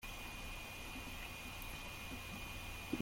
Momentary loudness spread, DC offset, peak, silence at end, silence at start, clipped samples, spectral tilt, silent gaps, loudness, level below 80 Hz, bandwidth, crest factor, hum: 1 LU; under 0.1%; -26 dBFS; 0 s; 0 s; under 0.1%; -3.5 dB/octave; none; -47 LUFS; -54 dBFS; 16.5 kHz; 20 dB; none